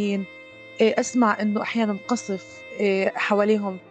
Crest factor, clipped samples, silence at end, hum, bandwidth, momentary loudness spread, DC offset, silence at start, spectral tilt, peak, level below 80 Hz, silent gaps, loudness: 16 dB; under 0.1%; 0.1 s; none; 9 kHz; 14 LU; under 0.1%; 0 s; -5 dB/octave; -6 dBFS; -74 dBFS; none; -23 LUFS